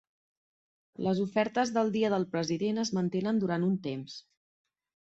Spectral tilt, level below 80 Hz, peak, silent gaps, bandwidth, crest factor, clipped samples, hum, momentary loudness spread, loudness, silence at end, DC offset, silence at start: -6 dB/octave; -72 dBFS; -14 dBFS; none; 8 kHz; 18 dB; under 0.1%; none; 8 LU; -30 LUFS; 0.95 s; under 0.1%; 1 s